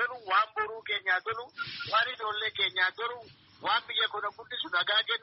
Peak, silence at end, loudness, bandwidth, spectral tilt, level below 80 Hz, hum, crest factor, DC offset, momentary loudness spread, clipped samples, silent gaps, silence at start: -14 dBFS; 0.05 s; -29 LUFS; 5.8 kHz; 3 dB/octave; -74 dBFS; none; 18 dB; under 0.1%; 10 LU; under 0.1%; none; 0 s